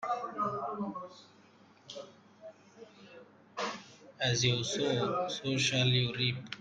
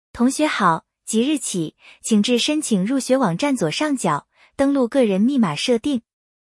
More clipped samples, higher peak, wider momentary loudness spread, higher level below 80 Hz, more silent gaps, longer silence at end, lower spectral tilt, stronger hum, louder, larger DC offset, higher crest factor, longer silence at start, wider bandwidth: neither; second, -16 dBFS vs -4 dBFS; first, 25 LU vs 8 LU; second, -68 dBFS vs -58 dBFS; neither; second, 0 s vs 0.55 s; about the same, -4 dB/octave vs -4.5 dB/octave; neither; second, -32 LUFS vs -20 LUFS; neither; about the same, 18 dB vs 16 dB; second, 0 s vs 0.15 s; second, 9.2 kHz vs 12 kHz